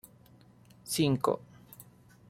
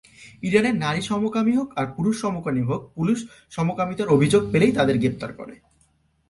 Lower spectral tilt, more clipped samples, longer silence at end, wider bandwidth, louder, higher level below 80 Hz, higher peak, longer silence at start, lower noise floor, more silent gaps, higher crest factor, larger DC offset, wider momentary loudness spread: second, -5 dB/octave vs -6.5 dB/octave; neither; second, 0.45 s vs 0.75 s; first, 16 kHz vs 11.5 kHz; second, -31 LUFS vs -22 LUFS; second, -66 dBFS vs -54 dBFS; second, -14 dBFS vs -4 dBFS; first, 0.85 s vs 0.2 s; second, -59 dBFS vs -64 dBFS; neither; about the same, 22 dB vs 18 dB; neither; first, 24 LU vs 12 LU